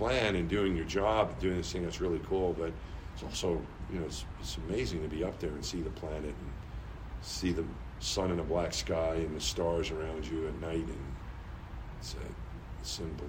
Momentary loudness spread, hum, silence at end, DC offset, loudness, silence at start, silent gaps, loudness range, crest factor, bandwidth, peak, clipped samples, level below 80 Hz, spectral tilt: 14 LU; none; 0 s; under 0.1%; -35 LUFS; 0 s; none; 5 LU; 20 dB; 16 kHz; -14 dBFS; under 0.1%; -44 dBFS; -5 dB/octave